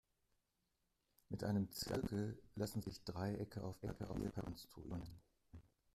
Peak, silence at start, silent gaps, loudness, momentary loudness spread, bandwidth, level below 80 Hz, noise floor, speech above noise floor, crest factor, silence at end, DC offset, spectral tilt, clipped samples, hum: -28 dBFS; 1.3 s; none; -46 LUFS; 19 LU; 15.5 kHz; -64 dBFS; -86 dBFS; 41 dB; 20 dB; 0.35 s; under 0.1%; -6 dB/octave; under 0.1%; none